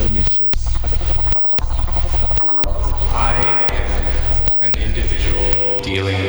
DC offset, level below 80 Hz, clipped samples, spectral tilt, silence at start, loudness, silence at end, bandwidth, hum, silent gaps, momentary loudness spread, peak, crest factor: 0.7%; -18 dBFS; under 0.1%; -5.5 dB/octave; 0 s; -15 LUFS; 0 s; over 20 kHz; none; none; 7 LU; -2 dBFS; 14 dB